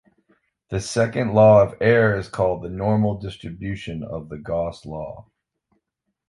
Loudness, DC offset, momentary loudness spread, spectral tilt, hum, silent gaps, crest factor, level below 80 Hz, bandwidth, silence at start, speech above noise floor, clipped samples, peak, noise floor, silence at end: -20 LUFS; under 0.1%; 18 LU; -6.5 dB/octave; none; none; 20 dB; -46 dBFS; 11.5 kHz; 0.7 s; 56 dB; under 0.1%; -2 dBFS; -77 dBFS; 1.1 s